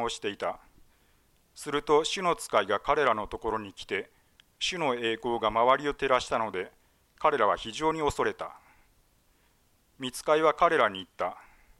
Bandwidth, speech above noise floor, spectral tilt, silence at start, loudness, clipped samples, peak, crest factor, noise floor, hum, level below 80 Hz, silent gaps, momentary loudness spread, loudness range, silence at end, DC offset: 13.5 kHz; 39 dB; -3.5 dB/octave; 0 s; -28 LUFS; under 0.1%; -10 dBFS; 20 dB; -67 dBFS; none; -56 dBFS; none; 12 LU; 3 LU; 0.4 s; under 0.1%